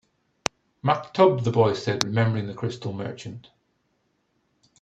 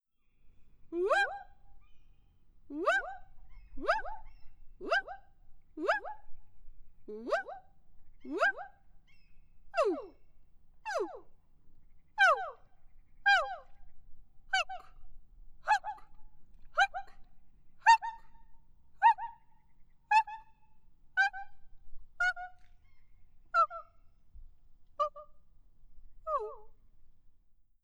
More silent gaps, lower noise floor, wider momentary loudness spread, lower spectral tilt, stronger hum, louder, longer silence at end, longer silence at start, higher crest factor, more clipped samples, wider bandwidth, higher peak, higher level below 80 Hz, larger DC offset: neither; first, -71 dBFS vs -61 dBFS; second, 15 LU vs 22 LU; first, -5.5 dB/octave vs -2 dB/octave; neither; first, -24 LUFS vs -32 LUFS; first, 1.4 s vs 0.55 s; first, 0.85 s vs 0.45 s; about the same, 26 dB vs 24 dB; neither; second, 9.2 kHz vs 12 kHz; first, 0 dBFS vs -12 dBFS; about the same, -60 dBFS vs -58 dBFS; neither